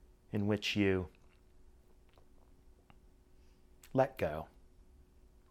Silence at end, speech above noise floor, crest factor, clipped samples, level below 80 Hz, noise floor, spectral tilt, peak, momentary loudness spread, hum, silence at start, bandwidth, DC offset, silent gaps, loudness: 1.05 s; 29 dB; 24 dB; under 0.1%; -62 dBFS; -62 dBFS; -6 dB/octave; -16 dBFS; 14 LU; none; 0.35 s; 16 kHz; under 0.1%; none; -35 LUFS